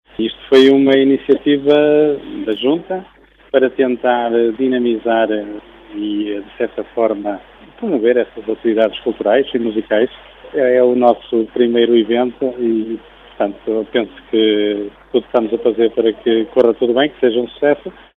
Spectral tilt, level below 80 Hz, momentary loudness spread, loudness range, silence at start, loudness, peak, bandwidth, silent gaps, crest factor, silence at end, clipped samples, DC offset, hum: -6.5 dB/octave; -52 dBFS; 10 LU; 4 LU; 0.2 s; -15 LUFS; 0 dBFS; 7.2 kHz; none; 16 dB; 0.25 s; under 0.1%; under 0.1%; none